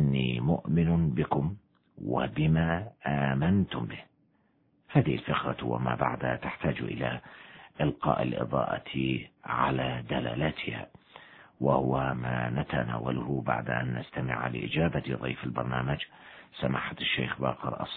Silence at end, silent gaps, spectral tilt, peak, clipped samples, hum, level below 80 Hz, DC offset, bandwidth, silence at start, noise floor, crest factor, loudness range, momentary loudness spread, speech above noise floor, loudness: 0 s; none; -10.5 dB/octave; -10 dBFS; under 0.1%; none; -50 dBFS; under 0.1%; 4.3 kHz; 0 s; -69 dBFS; 20 dB; 3 LU; 9 LU; 39 dB; -30 LUFS